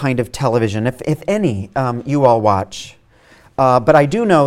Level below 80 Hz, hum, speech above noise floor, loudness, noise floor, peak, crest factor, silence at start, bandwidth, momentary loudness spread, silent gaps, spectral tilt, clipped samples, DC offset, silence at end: -46 dBFS; none; 33 dB; -16 LUFS; -48 dBFS; 0 dBFS; 16 dB; 0 s; 15 kHz; 11 LU; none; -7 dB/octave; under 0.1%; under 0.1%; 0 s